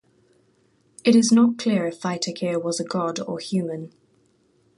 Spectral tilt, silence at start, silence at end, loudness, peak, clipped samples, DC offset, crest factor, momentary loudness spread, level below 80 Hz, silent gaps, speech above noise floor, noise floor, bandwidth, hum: -5 dB/octave; 1.05 s; 0.9 s; -22 LUFS; -6 dBFS; under 0.1%; under 0.1%; 18 dB; 13 LU; -70 dBFS; none; 41 dB; -63 dBFS; 11.5 kHz; none